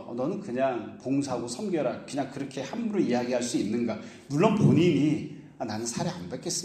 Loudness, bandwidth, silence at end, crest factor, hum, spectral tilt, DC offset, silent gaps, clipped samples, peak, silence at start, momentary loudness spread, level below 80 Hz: -28 LUFS; 13.5 kHz; 0 s; 22 dB; none; -6 dB/octave; under 0.1%; none; under 0.1%; -6 dBFS; 0 s; 13 LU; -66 dBFS